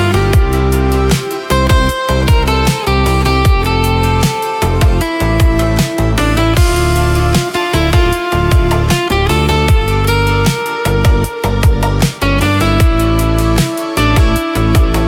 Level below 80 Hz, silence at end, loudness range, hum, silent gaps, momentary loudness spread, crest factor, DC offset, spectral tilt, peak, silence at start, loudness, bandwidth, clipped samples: -16 dBFS; 0 s; 0 LU; none; none; 3 LU; 10 dB; under 0.1%; -5.5 dB/octave; 0 dBFS; 0 s; -12 LUFS; 17 kHz; under 0.1%